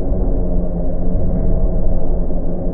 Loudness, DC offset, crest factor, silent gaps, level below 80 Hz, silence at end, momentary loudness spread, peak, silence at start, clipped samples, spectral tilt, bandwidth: -21 LUFS; under 0.1%; 12 dB; none; -16 dBFS; 0 s; 3 LU; -2 dBFS; 0 s; under 0.1%; -15 dB/octave; 1.5 kHz